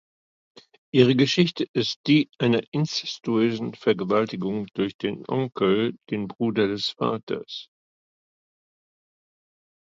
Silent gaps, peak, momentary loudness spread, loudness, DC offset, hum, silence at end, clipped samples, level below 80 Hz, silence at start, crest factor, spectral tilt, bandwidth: 1.69-1.74 s, 1.96-2.04 s, 2.68-2.72 s, 4.94-4.99 s, 7.23-7.27 s; -4 dBFS; 11 LU; -24 LUFS; under 0.1%; none; 2.25 s; under 0.1%; -64 dBFS; 0.95 s; 22 dB; -6 dB/octave; 7.6 kHz